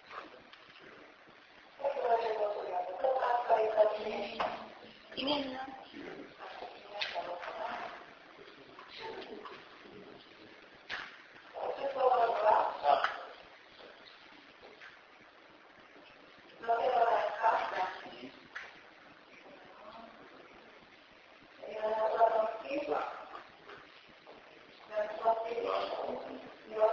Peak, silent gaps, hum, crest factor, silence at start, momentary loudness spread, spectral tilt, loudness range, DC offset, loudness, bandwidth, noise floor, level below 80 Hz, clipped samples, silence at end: -14 dBFS; none; none; 22 dB; 0.05 s; 25 LU; -0.5 dB/octave; 15 LU; under 0.1%; -34 LUFS; 7 kHz; -58 dBFS; -76 dBFS; under 0.1%; 0 s